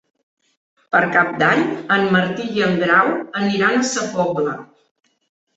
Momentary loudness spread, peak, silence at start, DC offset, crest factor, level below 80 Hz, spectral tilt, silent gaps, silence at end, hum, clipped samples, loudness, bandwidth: 7 LU; -2 dBFS; 0.9 s; under 0.1%; 18 dB; -60 dBFS; -4.5 dB/octave; none; 0.95 s; none; under 0.1%; -17 LUFS; 8.2 kHz